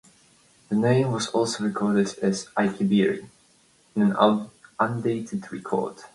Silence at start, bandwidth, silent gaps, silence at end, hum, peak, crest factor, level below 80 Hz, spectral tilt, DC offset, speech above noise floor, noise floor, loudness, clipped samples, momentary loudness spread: 0.7 s; 11.5 kHz; none; 0.1 s; none; -4 dBFS; 20 dB; -64 dBFS; -6 dB/octave; under 0.1%; 37 dB; -60 dBFS; -24 LUFS; under 0.1%; 9 LU